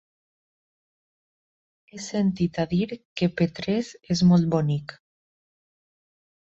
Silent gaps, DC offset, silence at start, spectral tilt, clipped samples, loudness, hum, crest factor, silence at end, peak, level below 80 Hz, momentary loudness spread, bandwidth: 3.05-3.16 s; under 0.1%; 1.95 s; -7 dB/octave; under 0.1%; -24 LUFS; none; 18 dB; 1.65 s; -10 dBFS; -56 dBFS; 12 LU; 7.8 kHz